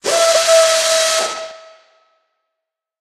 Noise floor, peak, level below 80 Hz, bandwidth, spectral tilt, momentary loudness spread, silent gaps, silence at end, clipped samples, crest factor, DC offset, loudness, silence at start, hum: -80 dBFS; 0 dBFS; -60 dBFS; 14.5 kHz; 1.5 dB/octave; 15 LU; none; 1.45 s; under 0.1%; 16 dB; under 0.1%; -13 LUFS; 0.05 s; none